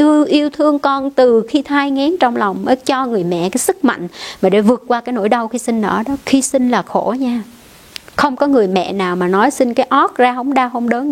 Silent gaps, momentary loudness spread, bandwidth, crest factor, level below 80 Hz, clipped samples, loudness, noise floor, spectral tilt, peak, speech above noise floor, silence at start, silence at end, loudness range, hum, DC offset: none; 6 LU; 16 kHz; 14 dB; -52 dBFS; under 0.1%; -15 LUFS; -36 dBFS; -4.5 dB/octave; 0 dBFS; 22 dB; 0 s; 0 s; 2 LU; none; under 0.1%